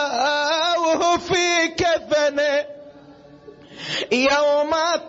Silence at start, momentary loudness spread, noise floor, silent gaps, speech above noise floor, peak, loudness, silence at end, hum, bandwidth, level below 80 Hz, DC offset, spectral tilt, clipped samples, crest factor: 0 s; 8 LU; -45 dBFS; none; 26 dB; -6 dBFS; -19 LUFS; 0 s; none; 8 kHz; -54 dBFS; under 0.1%; -2.5 dB/octave; under 0.1%; 14 dB